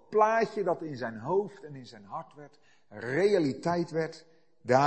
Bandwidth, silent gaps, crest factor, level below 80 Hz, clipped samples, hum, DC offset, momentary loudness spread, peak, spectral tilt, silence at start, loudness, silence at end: 8.6 kHz; none; 22 dB; -72 dBFS; under 0.1%; none; under 0.1%; 20 LU; -8 dBFS; -6.5 dB/octave; 0.1 s; -29 LUFS; 0 s